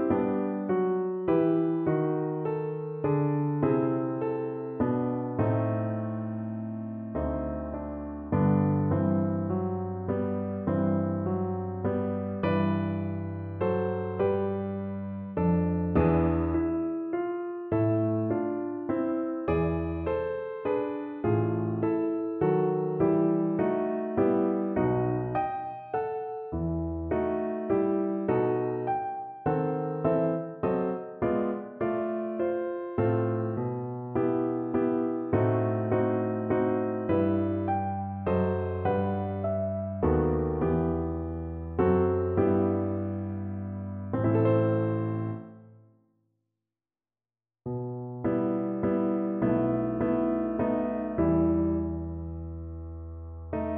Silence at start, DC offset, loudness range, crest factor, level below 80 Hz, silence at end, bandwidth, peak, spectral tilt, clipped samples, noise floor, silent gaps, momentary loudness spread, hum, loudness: 0 s; under 0.1%; 3 LU; 16 dB; -48 dBFS; 0 s; 4.1 kHz; -12 dBFS; -12.5 dB/octave; under 0.1%; under -90 dBFS; none; 9 LU; none; -29 LUFS